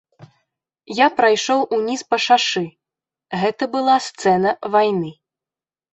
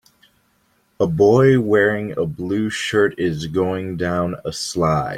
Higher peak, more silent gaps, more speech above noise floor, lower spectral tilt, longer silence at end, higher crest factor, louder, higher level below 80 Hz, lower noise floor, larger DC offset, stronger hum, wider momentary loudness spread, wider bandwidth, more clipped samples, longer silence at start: about the same, -2 dBFS vs -2 dBFS; neither; first, over 72 dB vs 44 dB; second, -4 dB/octave vs -6 dB/octave; first, 0.8 s vs 0 s; about the same, 18 dB vs 16 dB; about the same, -18 LUFS vs -19 LUFS; second, -64 dBFS vs -50 dBFS; first, under -90 dBFS vs -62 dBFS; neither; neither; about the same, 10 LU vs 10 LU; second, 8.2 kHz vs 14.5 kHz; neither; second, 0.2 s vs 1 s